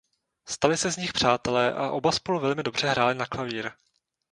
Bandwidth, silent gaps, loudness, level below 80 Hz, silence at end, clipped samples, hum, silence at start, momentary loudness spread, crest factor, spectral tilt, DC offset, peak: 11.5 kHz; none; -25 LUFS; -58 dBFS; 0.6 s; under 0.1%; none; 0.45 s; 8 LU; 22 dB; -3.5 dB/octave; under 0.1%; -4 dBFS